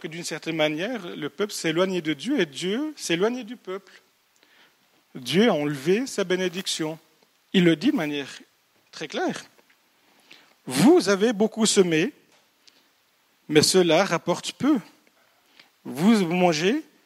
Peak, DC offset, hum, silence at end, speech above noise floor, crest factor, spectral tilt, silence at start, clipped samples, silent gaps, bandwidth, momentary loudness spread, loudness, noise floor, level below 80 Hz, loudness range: -2 dBFS; under 0.1%; none; 0.25 s; 42 dB; 22 dB; -4.5 dB/octave; 0.05 s; under 0.1%; none; 16 kHz; 17 LU; -23 LUFS; -65 dBFS; -74 dBFS; 5 LU